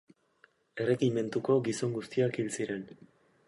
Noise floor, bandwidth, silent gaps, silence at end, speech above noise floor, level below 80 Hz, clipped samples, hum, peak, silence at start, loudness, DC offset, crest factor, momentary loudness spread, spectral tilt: -67 dBFS; 11.5 kHz; none; 0.55 s; 36 dB; -74 dBFS; under 0.1%; none; -16 dBFS; 0.75 s; -31 LUFS; under 0.1%; 18 dB; 10 LU; -6 dB/octave